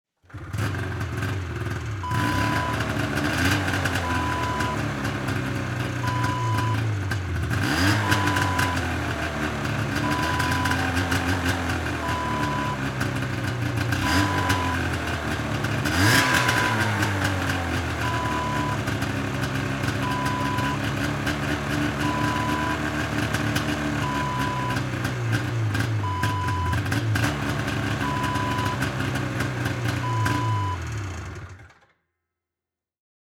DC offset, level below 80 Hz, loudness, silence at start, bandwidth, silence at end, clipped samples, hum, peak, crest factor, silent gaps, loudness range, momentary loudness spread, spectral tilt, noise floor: under 0.1%; -42 dBFS; -25 LUFS; 0.3 s; 18.5 kHz; 1.55 s; under 0.1%; none; -4 dBFS; 22 dB; none; 4 LU; 6 LU; -5 dB/octave; -88 dBFS